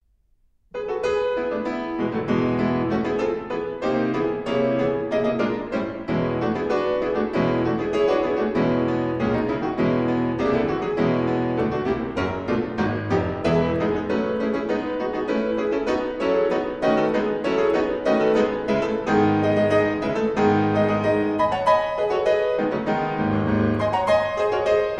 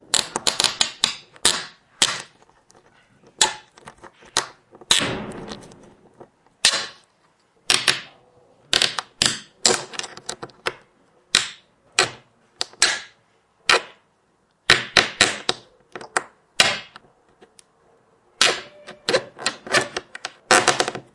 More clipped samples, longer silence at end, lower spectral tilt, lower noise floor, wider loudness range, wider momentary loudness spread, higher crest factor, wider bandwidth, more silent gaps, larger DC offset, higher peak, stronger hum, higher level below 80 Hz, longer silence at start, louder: neither; second, 0 s vs 0.15 s; first, -7.5 dB/octave vs -0.5 dB/octave; about the same, -62 dBFS vs -64 dBFS; about the same, 3 LU vs 4 LU; second, 5 LU vs 16 LU; second, 16 dB vs 24 dB; second, 9.4 kHz vs 12 kHz; neither; neither; second, -6 dBFS vs 0 dBFS; neither; first, -48 dBFS vs -56 dBFS; first, 0.75 s vs 0.15 s; about the same, -22 LUFS vs -20 LUFS